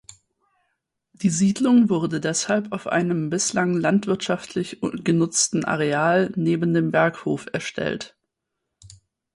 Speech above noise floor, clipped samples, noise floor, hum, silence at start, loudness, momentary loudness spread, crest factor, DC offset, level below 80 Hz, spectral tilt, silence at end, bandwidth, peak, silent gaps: 59 dB; under 0.1%; -80 dBFS; none; 1.2 s; -22 LUFS; 9 LU; 16 dB; under 0.1%; -62 dBFS; -4.5 dB/octave; 0.5 s; 11.5 kHz; -6 dBFS; none